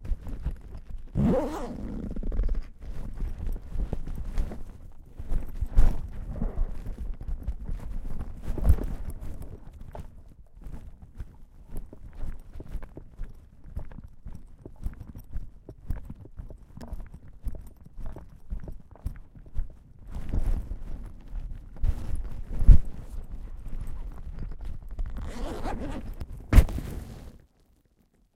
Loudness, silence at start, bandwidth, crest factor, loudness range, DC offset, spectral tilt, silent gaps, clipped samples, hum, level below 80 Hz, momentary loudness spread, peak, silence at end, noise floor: -34 LUFS; 0 s; 12 kHz; 26 dB; 15 LU; under 0.1%; -8 dB/octave; none; under 0.1%; none; -30 dBFS; 20 LU; -2 dBFS; 1 s; -65 dBFS